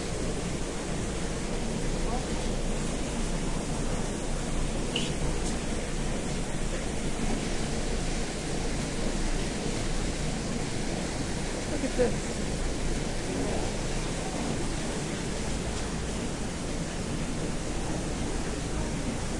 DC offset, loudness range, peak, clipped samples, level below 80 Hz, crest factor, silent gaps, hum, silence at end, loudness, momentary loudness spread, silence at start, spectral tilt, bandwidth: under 0.1%; 2 LU; -12 dBFS; under 0.1%; -34 dBFS; 18 dB; none; none; 0 s; -32 LUFS; 2 LU; 0 s; -4.5 dB/octave; 11.5 kHz